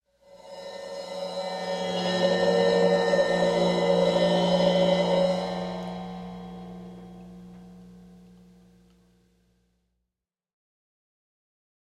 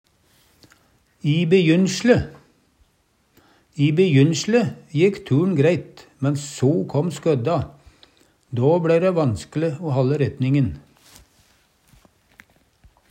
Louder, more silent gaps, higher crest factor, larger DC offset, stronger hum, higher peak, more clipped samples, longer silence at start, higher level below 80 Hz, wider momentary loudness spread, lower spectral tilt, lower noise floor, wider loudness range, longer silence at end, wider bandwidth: second, -24 LUFS vs -20 LUFS; neither; about the same, 18 dB vs 20 dB; neither; first, 60 Hz at -40 dBFS vs none; second, -10 dBFS vs -2 dBFS; neither; second, 0.35 s vs 1.25 s; second, -60 dBFS vs -52 dBFS; first, 21 LU vs 10 LU; about the same, -5.5 dB/octave vs -6.5 dB/octave; first, -87 dBFS vs -64 dBFS; first, 19 LU vs 4 LU; first, 3.9 s vs 2.3 s; first, 11 kHz vs 9.6 kHz